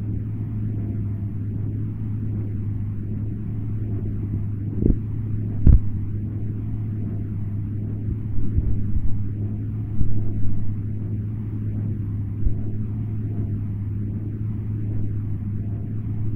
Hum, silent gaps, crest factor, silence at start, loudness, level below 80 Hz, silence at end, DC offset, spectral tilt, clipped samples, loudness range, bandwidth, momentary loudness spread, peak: none; none; 20 dB; 0 s; -27 LUFS; -30 dBFS; 0 s; 0.6%; -12.5 dB/octave; under 0.1%; 4 LU; 2.6 kHz; 4 LU; -2 dBFS